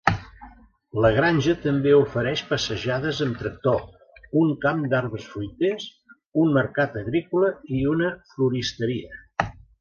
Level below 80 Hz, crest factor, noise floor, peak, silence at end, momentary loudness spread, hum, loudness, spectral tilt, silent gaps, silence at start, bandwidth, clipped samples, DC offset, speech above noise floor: -48 dBFS; 24 dB; -49 dBFS; 0 dBFS; 0.3 s; 12 LU; none; -24 LUFS; -6.5 dB/octave; 6.26-6.30 s; 0.05 s; 7.2 kHz; under 0.1%; under 0.1%; 26 dB